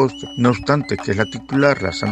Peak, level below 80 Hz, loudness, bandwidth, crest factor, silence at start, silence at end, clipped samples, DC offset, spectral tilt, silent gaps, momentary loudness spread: 0 dBFS; -46 dBFS; -19 LUFS; 9.4 kHz; 18 dB; 0 s; 0 s; under 0.1%; under 0.1%; -6 dB/octave; none; 5 LU